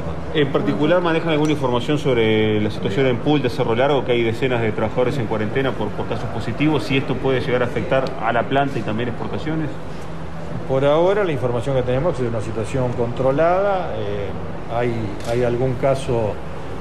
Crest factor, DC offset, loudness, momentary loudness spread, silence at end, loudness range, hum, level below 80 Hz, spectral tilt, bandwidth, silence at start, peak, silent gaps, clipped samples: 14 dB; 4%; -20 LUFS; 9 LU; 0 s; 3 LU; none; -40 dBFS; -7 dB/octave; 13 kHz; 0 s; -6 dBFS; none; under 0.1%